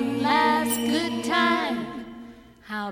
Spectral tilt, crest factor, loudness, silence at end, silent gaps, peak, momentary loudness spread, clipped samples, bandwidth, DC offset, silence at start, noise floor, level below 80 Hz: -3.5 dB/octave; 16 dB; -23 LUFS; 0 s; none; -8 dBFS; 17 LU; under 0.1%; 17.5 kHz; under 0.1%; 0 s; -45 dBFS; -58 dBFS